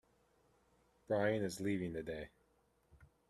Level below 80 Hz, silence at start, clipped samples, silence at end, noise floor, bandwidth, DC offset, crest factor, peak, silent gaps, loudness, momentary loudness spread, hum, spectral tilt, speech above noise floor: -68 dBFS; 1.1 s; under 0.1%; 0.25 s; -76 dBFS; 13.5 kHz; under 0.1%; 20 dB; -22 dBFS; none; -39 LUFS; 12 LU; none; -6 dB/octave; 37 dB